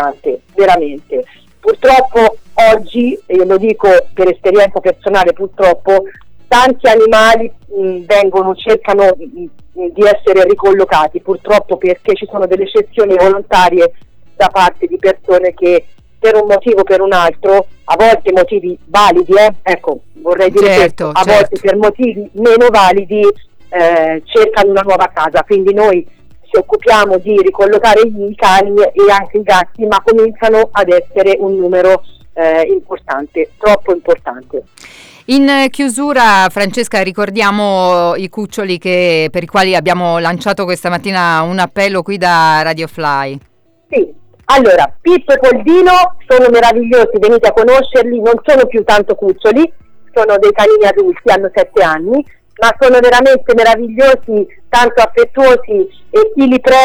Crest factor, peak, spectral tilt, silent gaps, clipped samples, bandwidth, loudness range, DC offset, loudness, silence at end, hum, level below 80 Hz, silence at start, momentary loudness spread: 8 dB; 0 dBFS; -4.5 dB/octave; none; under 0.1%; 19.5 kHz; 4 LU; under 0.1%; -10 LUFS; 0 s; none; -38 dBFS; 0 s; 9 LU